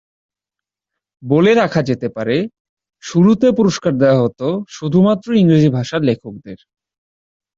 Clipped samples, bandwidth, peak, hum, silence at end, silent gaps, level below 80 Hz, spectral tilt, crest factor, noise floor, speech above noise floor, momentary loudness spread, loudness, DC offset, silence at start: under 0.1%; 7.6 kHz; -2 dBFS; none; 1.05 s; 2.60-2.77 s; -52 dBFS; -7 dB/octave; 14 dB; -86 dBFS; 71 dB; 12 LU; -15 LUFS; under 0.1%; 1.25 s